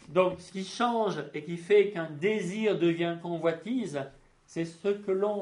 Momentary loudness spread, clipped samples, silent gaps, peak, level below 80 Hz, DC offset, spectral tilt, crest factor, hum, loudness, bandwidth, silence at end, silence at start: 13 LU; under 0.1%; none; -10 dBFS; -70 dBFS; under 0.1%; -6 dB/octave; 20 dB; none; -30 LUFS; 11 kHz; 0 s; 0.1 s